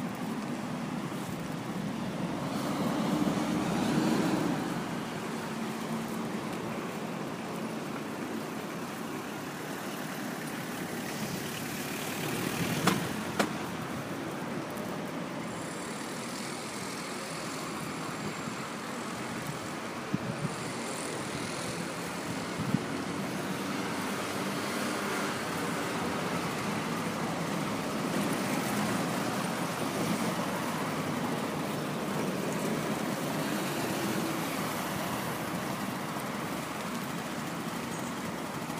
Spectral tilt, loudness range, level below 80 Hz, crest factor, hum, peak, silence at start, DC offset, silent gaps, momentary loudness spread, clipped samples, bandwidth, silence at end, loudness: -4.5 dB/octave; 5 LU; -64 dBFS; 22 dB; none; -10 dBFS; 0 s; under 0.1%; none; 6 LU; under 0.1%; 15.5 kHz; 0 s; -34 LUFS